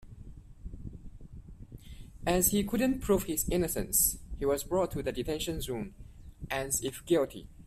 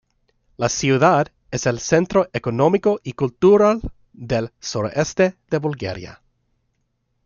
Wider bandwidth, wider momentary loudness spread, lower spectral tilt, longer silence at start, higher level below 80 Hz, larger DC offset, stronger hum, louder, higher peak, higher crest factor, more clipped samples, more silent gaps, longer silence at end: first, 16 kHz vs 7.4 kHz; first, 25 LU vs 12 LU; second, -4 dB/octave vs -5.5 dB/octave; second, 0 s vs 0.6 s; about the same, -46 dBFS vs -46 dBFS; neither; neither; second, -30 LUFS vs -19 LUFS; second, -12 dBFS vs -2 dBFS; about the same, 20 dB vs 18 dB; neither; neither; second, 0 s vs 1.1 s